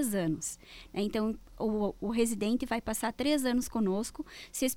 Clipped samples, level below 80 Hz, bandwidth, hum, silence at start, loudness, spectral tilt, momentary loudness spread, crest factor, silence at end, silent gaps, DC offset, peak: under 0.1%; -54 dBFS; 17.5 kHz; none; 0 s; -32 LUFS; -4.5 dB/octave; 10 LU; 16 dB; 0 s; none; under 0.1%; -16 dBFS